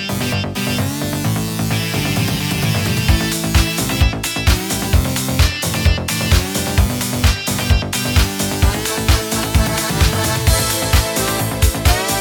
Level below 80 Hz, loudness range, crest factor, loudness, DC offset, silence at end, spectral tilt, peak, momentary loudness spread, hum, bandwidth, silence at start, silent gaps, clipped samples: -22 dBFS; 2 LU; 16 dB; -17 LUFS; under 0.1%; 0 s; -4 dB/octave; 0 dBFS; 4 LU; none; 19.5 kHz; 0 s; none; under 0.1%